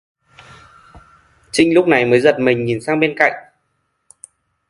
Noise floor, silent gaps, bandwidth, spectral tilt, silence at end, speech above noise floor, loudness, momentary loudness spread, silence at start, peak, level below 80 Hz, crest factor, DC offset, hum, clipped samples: -68 dBFS; none; 11.5 kHz; -5.5 dB/octave; 1.3 s; 54 dB; -15 LUFS; 7 LU; 0.95 s; 0 dBFS; -54 dBFS; 18 dB; under 0.1%; none; under 0.1%